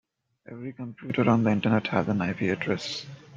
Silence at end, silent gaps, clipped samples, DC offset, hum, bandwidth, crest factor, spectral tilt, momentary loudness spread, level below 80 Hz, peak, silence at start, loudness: 0 s; none; under 0.1%; under 0.1%; none; 7.6 kHz; 20 dB; -6.5 dB/octave; 16 LU; -64 dBFS; -8 dBFS; 0.5 s; -26 LUFS